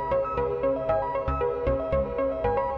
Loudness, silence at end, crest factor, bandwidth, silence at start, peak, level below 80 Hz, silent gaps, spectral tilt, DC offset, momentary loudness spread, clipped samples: -27 LUFS; 0 s; 14 dB; 5.4 kHz; 0 s; -12 dBFS; -38 dBFS; none; -9.5 dB/octave; under 0.1%; 2 LU; under 0.1%